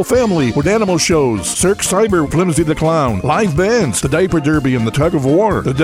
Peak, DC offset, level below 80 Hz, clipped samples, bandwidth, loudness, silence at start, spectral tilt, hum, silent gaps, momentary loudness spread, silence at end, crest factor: -2 dBFS; under 0.1%; -34 dBFS; under 0.1%; 16 kHz; -14 LUFS; 0 s; -5 dB/octave; none; none; 2 LU; 0 s; 12 dB